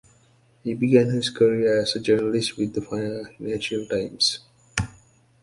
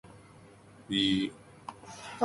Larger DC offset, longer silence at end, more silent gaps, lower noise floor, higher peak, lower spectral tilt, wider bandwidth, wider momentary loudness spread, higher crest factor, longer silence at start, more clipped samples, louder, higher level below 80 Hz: neither; first, 0.5 s vs 0 s; neither; first, -59 dBFS vs -55 dBFS; first, -4 dBFS vs -14 dBFS; about the same, -5 dB/octave vs -4.5 dB/octave; about the same, 11.5 kHz vs 11.5 kHz; second, 12 LU vs 20 LU; about the same, 20 dB vs 20 dB; first, 0.65 s vs 0.05 s; neither; first, -23 LUFS vs -30 LUFS; first, -52 dBFS vs -62 dBFS